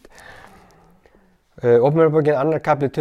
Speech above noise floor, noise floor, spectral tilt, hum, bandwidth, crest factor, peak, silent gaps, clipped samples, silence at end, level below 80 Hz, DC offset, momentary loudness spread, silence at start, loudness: 40 dB; -56 dBFS; -8.5 dB/octave; none; 7.4 kHz; 16 dB; -4 dBFS; none; under 0.1%; 0 s; -56 dBFS; under 0.1%; 5 LU; 0.3 s; -17 LUFS